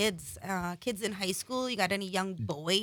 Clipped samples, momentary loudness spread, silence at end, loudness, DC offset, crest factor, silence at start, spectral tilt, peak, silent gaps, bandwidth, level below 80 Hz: under 0.1%; 6 LU; 0 s; -33 LUFS; under 0.1%; 18 dB; 0 s; -3.5 dB/octave; -14 dBFS; none; 19.5 kHz; -64 dBFS